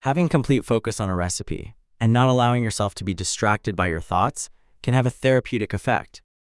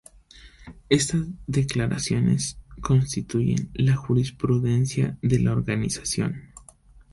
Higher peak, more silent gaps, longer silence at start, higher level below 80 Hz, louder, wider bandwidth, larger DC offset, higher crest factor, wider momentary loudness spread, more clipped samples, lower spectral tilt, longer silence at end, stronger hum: about the same, -4 dBFS vs -4 dBFS; neither; second, 0.05 s vs 0.35 s; about the same, -46 dBFS vs -44 dBFS; about the same, -22 LUFS vs -24 LUFS; about the same, 12 kHz vs 11.5 kHz; neither; about the same, 18 dB vs 20 dB; first, 8 LU vs 5 LU; neither; about the same, -5.5 dB/octave vs -5.5 dB/octave; second, 0.25 s vs 0.55 s; neither